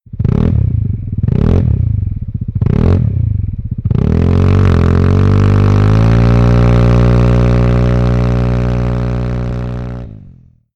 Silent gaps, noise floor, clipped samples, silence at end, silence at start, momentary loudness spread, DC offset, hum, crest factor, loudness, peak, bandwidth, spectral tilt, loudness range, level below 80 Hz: none; -40 dBFS; under 0.1%; 0.45 s; 0.1 s; 10 LU; under 0.1%; none; 8 dB; -12 LUFS; -4 dBFS; 6.8 kHz; -9.5 dB/octave; 5 LU; -18 dBFS